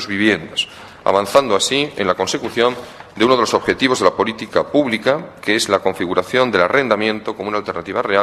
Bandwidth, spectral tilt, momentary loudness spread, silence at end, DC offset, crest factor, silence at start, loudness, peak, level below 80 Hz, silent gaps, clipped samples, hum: 14 kHz; -3.5 dB/octave; 8 LU; 0 s; under 0.1%; 18 dB; 0 s; -17 LUFS; 0 dBFS; -54 dBFS; none; under 0.1%; none